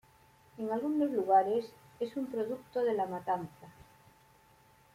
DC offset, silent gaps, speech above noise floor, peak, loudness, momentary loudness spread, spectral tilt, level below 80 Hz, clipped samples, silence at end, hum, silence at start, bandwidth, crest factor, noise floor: under 0.1%; none; 31 dB; -16 dBFS; -33 LUFS; 13 LU; -7 dB/octave; -74 dBFS; under 0.1%; 1.25 s; none; 0.55 s; 16 kHz; 18 dB; -63 dBFS